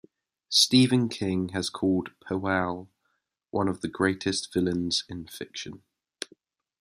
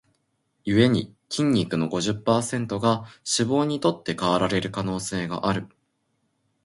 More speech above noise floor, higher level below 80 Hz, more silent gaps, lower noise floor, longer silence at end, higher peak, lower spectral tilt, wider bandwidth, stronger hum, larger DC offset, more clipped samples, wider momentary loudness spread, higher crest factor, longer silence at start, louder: about the same, 50 dB vs 49 dB; second, -64 dBFS vs -54 dBFS; neither; first, -77 dBFS vs -72 dBFS; about the same, 1.05 s vs 1 s; about the same, -6 dBFS vs -6 dBFS; about the same, -4 dB/octave vs -5 dB/octave; first, 15 kHz vs 11.5 kHz; neither; neither; neither; first, 19 LU vs 7 LU; about the same, 22 dB vs 20 dB; second, 0.5 s vs 0.65 s; about the same, -26 LUFS vs -24 LUFS